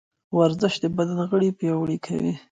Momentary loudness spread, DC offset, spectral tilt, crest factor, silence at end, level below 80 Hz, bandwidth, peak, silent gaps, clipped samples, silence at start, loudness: 6 LU; under 0.1%; -7 dB/octave; 16 dB; 0.15 s; -60 dBFS; 9.2 kHz; -6 dBFS; none; under 0.1%; 0.3 s; -24 LUFS